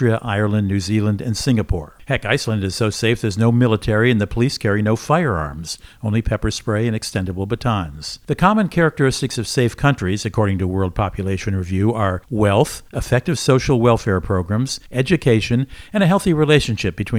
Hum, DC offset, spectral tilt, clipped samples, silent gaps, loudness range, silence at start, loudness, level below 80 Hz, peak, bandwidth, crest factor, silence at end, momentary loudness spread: none; under 0.1%; -6 dB/octave; under 0.1%; none; 3 LU; 0 s; -19 LUFS; -36 dBFS; 0 dBFS; 15.5 kHz; 18 dB; 0 s; 8 LU